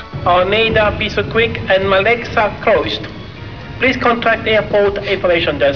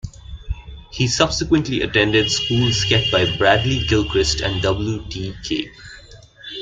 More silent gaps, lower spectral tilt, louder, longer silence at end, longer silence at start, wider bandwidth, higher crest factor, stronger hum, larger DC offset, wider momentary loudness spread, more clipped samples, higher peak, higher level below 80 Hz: neither; first, -6 dB/octave vs -4.5 dB/octave; first, -14 LUFS vs -18 LUFS; about the same, 0 s vs 0 s; about the same, 0 s vs 0.05 s; second, 5.4 kHz vs 9.4 kHz; about the same, 14 dB vs 18 dB; neither; first, 0.7% vs under 0.1%; second, 10 LU vs 18 LU; neither; about the same, 0 dBFS vs -2 dBFS; about the same, -34 dBFS vs -34 dBFS